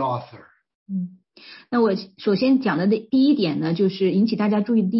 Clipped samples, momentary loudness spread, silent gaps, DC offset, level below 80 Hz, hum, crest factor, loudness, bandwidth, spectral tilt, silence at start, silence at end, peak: under 0.1%; 11 LU; 0.75-0.86 s; under 0.1%; -68 dBFS; none; 12 dB; -21 LUFS; 5.8 kHz; -10.5 dB/octave; 0 s; 0 s; -8 dBFS